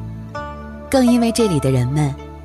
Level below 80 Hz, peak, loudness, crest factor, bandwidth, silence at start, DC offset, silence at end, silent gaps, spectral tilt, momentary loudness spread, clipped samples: -36 dBFS; -4 dBFS; -17 LUFS; 14 dB; 14 kHz; 0 s; under 0.1%; 0 s; none; -6.5 dB/octave; 15 LU; under 0.1%